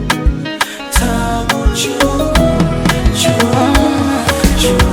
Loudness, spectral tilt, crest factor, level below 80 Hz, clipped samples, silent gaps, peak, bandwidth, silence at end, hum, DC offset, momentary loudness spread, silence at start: -13 LUFS; -4.5 dB/octave; 12 dB; -18 dBFS; under 0.1%; none; 0 dBFS; 18.5 kHz; 0 s; none; under 0.1%; 4 LU; 0 s